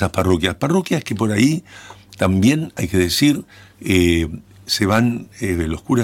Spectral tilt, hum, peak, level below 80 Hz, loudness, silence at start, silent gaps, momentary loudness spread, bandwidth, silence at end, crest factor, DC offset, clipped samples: -5.5 dB/octave; none; -4 dBFS; -38 dBFS; -18 LUFS; 0 s; none; 9 LU; 17 kHz; 0 s; 14 dB; under 0.1%; under 0.1%